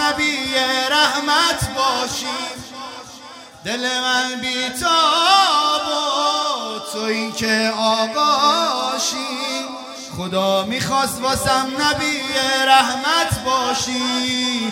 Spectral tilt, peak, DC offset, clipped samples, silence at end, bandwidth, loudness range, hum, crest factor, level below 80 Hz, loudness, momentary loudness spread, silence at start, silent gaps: -2 dB/octave; 0 dBFS; under 0.1%; under 0.1%; 0 s; 16.5 kHz; 3 LU; none; 20 dB; -48 dBFS; -18 LUFS; 12 LU; 0 s; none